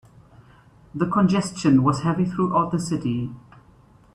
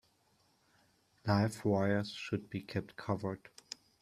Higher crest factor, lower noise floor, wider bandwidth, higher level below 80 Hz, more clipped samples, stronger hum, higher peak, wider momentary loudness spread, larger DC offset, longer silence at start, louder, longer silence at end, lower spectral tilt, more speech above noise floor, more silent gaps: about the same, 18 dB vs 22 dB; second, -53 dBFS vs -73 dBFS; second, 11 kHz vs 14 kHz; first, -54 dBFS vs -70 dBFS; neither; neither; first, -6 dBFS vs -16 dBFS; second, 10 LU vs 17 LU; neither; second, 0.95 s vs 1.25 s; first, -22 LUFS vs -36 LUFS; about the same, 0.75 s vs 0.65 s; about the same, -7 dB/octave vs -6.5 dB/octave; second, 32 dB vs 38 dB; neither